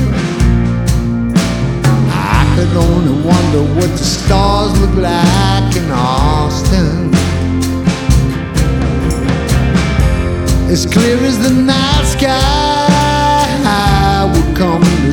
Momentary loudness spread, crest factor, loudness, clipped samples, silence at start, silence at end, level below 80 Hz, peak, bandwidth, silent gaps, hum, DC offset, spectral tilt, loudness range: 4 LU; 10 dB; -12 LUFS; under 0.1%; 0 s; 0 s; -18 dBFS; 0 dBFS; 18.5 kHz; none; none; under 0.1%; -5.5 dB/octave; 2 LU